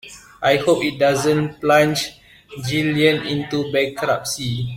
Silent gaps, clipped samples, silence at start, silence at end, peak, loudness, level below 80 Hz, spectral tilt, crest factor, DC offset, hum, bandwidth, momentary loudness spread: none; under 0.1%; 0.05 s; 0 s; -2 dBFS; -19 LUFS; -52 dBFS; -4.5 dB/octave; 18 dB; under 0.1%; none; 16.5 kHz; 8 LU